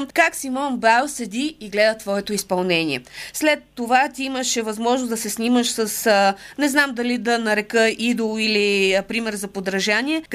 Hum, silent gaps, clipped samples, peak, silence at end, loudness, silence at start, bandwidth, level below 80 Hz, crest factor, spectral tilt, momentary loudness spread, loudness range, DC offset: none; none; under 0.1%; -2 dBFS; 0 s; -20 LUFS; 0 s; 15.5 kHz; -58 dBFS; 18 dB; -3 dB/octave; 8 LU; 2 LU; under 0.1%